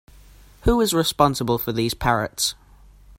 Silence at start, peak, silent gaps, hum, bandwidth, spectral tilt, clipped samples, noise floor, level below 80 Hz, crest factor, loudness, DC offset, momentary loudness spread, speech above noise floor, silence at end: 0.65 s; -2 dBFS; none; none; 16.5 kHz; -4 dB/octave; under 0.1%; -49 dBFS; -36 dBFS; 20 dB; -21 LUFS; under 0.1%; 5 LU; 28 dB; 0.65 s